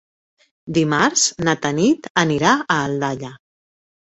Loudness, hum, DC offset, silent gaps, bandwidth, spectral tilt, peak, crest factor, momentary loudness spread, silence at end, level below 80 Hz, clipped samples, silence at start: -18 LUFS; none; under 0.1%; 2.10-2.15 s; 8.2 kHz; -3.5 dB/octave; -2 dBFS; 18 dB; 8 LU; 0.75 s; -56 dBFS; under 0.1%; 0.65 s